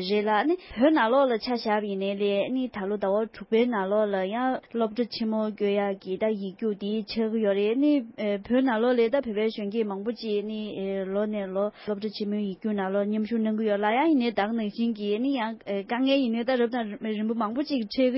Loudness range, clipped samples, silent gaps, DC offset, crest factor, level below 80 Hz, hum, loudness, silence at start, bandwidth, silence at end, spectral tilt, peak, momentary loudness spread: 3 LU; under 0.1%; none; under 0.1%; 16 dB; -64 dBFS; none; -27 LUFS; 0 s; 5.8 kHz; 0 s; -10 dB/octave; -10 dBFS; 7 LU